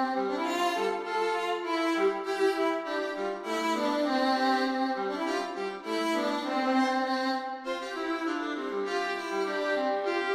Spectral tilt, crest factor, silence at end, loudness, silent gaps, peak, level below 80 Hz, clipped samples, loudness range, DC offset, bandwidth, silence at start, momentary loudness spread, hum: -3.5 dB/octave; 14 dB; 0 s; -29 LUFS; none; -14 dBFS; -74 dBFS; under 0.1%; 2 LU; under 0.1%; 15.5 kHz; 0 s; 6 LU; none